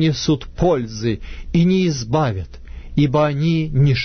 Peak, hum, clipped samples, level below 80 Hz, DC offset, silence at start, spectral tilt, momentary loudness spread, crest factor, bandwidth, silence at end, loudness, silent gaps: -4 dBFS; none; under 0.1%; -34 dBFS; under 0.1%; 0 s; -6.5 dB/octave; 10 LU; 14 dB; 6.6 kHz; 0 s; -19 LUFS; none